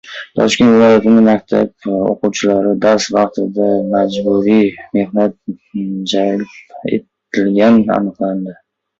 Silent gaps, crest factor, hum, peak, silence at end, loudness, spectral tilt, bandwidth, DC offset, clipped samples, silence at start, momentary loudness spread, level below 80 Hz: none; 12 dB; none; 0 dBFS; 0.45 s; -13 LUFS; -5.5 dB/octave; 8 kHz; under 0.1%; under 0.1%; 0.05 s; 13 LU; -52 dBFS